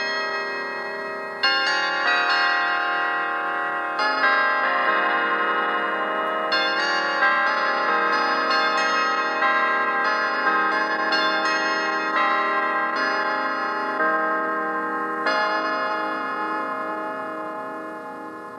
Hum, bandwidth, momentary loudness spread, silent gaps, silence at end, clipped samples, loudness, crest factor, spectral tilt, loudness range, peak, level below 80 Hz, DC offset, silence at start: none; 12.5 kHz; 9 LU; none; 0 s; under 0.1%; -22 LUFS; 16 dB; -2 dB/octave; 3 LU; -6 dBFS; -80 dBFS; under 0.1%; 0 s